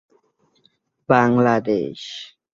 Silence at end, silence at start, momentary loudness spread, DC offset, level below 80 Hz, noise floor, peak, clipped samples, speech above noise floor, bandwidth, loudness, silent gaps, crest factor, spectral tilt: 0.3 s; 1.1 s; 17 LU; under 0.1%; -60 dBFS; -64 dBFS; -2 dBFS; under 0.1%; 45 dB; 7.4 kHz; -18 LUFS; none; 20 dB; -7 dB/octave